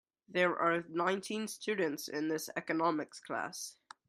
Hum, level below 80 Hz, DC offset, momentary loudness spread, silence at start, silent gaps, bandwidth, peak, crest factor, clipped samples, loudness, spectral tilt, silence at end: none; -82 dBFS; under 0.1%; 8 LU; 0.3 s; none; 15.5 kHz; -16 dBFS; 20 dB; under 0.1%; -35 LUFS; -4 dB/octave; 0.35 s